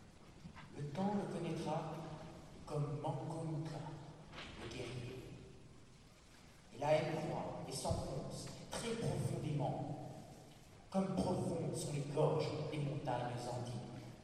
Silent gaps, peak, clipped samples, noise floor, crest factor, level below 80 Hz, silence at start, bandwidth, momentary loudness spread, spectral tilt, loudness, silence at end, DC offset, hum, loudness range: none; -22 dBFS; under 0.1%; -62 dBFS; 20 dB; -62 dBFS; 0 s; 13 kHz; 21 LU; -6 dB/octave; -42 LUFS; 0 s; under 0.1%; none; 6 LU